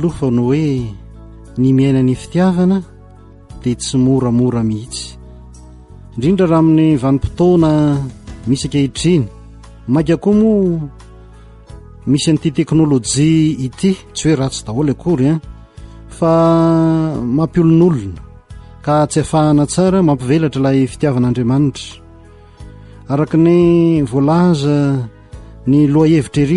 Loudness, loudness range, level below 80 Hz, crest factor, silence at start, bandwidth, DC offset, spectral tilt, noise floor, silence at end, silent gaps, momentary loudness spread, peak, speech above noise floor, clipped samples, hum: -14 LUFS; 3 LU; -36 dBFS; 12 dB; 0 s; 11.5 kHz; under 0.1%; -7 dB/octave; -40 dBFS; 0 s; none; 11 LU; -2 dBFS; 27 dB; under 0.1%; none